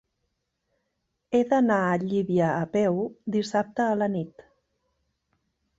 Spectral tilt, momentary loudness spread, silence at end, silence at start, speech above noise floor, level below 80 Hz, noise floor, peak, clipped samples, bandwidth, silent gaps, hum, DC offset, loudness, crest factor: -7 dB/octave; 7 LU; 1.4 s; 1.3 s; 54 dB; -66 dBFS; -78 dBFS; -10 dBFS; under 0.1%; 8 kHz; none; none; under 0.1%; -25 LUFS; 18 dB